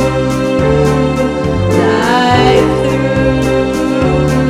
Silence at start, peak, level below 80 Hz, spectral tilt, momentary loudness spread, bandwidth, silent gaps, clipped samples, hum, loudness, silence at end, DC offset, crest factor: 0 s; 0 dBFS; -26 dBFS; -6.5 dB/octave; 5 LU; 14.5 kHz; none; under 0.1%; none; -11 LUFS; 0 s; under 0.1%; 10 dB